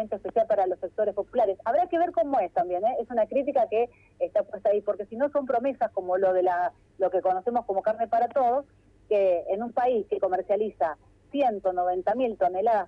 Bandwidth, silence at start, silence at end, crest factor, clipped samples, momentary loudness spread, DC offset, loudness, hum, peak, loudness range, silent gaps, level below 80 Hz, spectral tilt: 5.6 kHz; 0 s; 0 s; 14 dB; under 0.1%; 5 LU; under 0.1%; -26 LUFS; none; -12 dBFS; 1 LU; none; -64 dBFS; -7.5 dB/octave